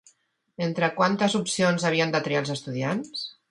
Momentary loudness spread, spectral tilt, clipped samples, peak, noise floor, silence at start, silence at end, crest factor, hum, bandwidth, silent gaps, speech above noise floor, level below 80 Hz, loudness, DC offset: 8 LU; -4.5 dB/octave; under 0.1%; -6 dBFS; -64 dBFS; 0.6 s; 0.2 s; 20 dB; none; 11.5 kHz; none; 39 dB; -68 dBFS; -25 LUFS; under 0.1%